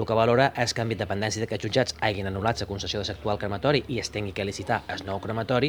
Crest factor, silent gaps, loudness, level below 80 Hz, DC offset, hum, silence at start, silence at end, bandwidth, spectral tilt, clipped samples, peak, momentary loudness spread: 22 dB; none; -27 LUFS; -48 dBFS; under 0.1%; none; 0 s; 0 s; over 20 kHz; -5 dB/octave; under 0.1%; -4 dBFS; 9 LU